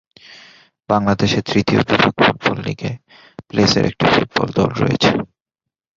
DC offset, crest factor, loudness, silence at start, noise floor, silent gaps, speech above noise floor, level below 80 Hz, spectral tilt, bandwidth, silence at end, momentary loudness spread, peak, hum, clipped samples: under 0.1%; 18 dB; -16 LUFS; 0.3 s; -84 dBFS; none; 68 dB; -44 dBFS; -5.5 dB/octave; 7.6 kHz; 0.7 s; 10 LU; 0 dBFS; none; under 0.1%